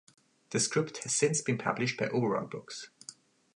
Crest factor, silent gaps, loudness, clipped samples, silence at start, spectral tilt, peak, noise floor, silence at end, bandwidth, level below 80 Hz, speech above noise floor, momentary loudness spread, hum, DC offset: 20 dB; none; -31 LUFS; under 0.1%; 0.5 s; -3.5 dB/octave; -12 dBFS; -54 dBFS; 0.45 s; 11.5 kHz; -74 dBFS; 22 dB; 16 LU; none; under 0.1%